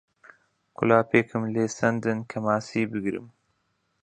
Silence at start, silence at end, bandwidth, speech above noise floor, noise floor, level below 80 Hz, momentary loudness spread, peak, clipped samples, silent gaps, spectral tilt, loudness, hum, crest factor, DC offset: 0.8 s; 0.75 s; 9.2 kHz; 48 dB; -73 dBFS; -64 dBFS; 9 LU; -4 dBFS; under 0.1%; none; -6.5 dB/octave; -25 LUFS; none; 22 dB; under 0.1%